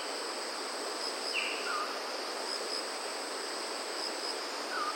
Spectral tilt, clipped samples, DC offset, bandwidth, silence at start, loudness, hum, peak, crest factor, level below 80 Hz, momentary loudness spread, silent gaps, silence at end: 1 dB/octave; under 0.1%; under 0.1%; 16.5 kHz; 0 s; -35 LUFS; none; -20 dBFS; 16 dB; under -90 dBFS; 4 LU; none; 0 s